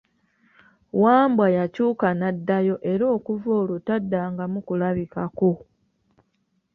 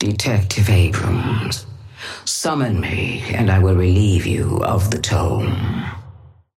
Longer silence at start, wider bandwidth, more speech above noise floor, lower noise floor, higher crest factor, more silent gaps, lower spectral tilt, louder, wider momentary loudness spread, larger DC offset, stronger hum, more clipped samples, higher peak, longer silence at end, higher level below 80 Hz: first, 0.95 s vs 0 s; second, 4.7 kHz vs 14.5 kHz; first, 49 dB vs 25 dB; first, -71 dBFS vs -42 dBFS; about the same, 18 dB vs 14 dB; neither; first, -10 dB/octave vs -5.5 dB/octave; second, -22 LUFS vs -18 LUFS; about the same, 10 LU vs 11 LU; neither; neither; neither; about the same, -4 dBFS vs -4 dBFS; first, 1.15 s vs 0.45 s; second, -62 dBFS vs -36 dBFS